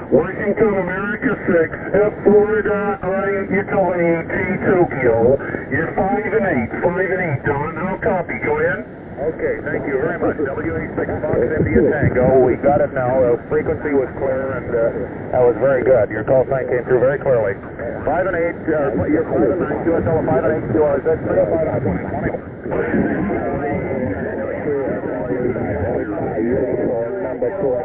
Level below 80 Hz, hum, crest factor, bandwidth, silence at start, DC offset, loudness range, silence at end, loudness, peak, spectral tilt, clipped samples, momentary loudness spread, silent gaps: -38 dBFS; none; 16 dB; 3.9 kHz; 0 s; under 0.1%; 4 LU; 0 s; -18 LUFS; -2 dBFS; -12 dB/octave; under 0.1%; 7 LU; none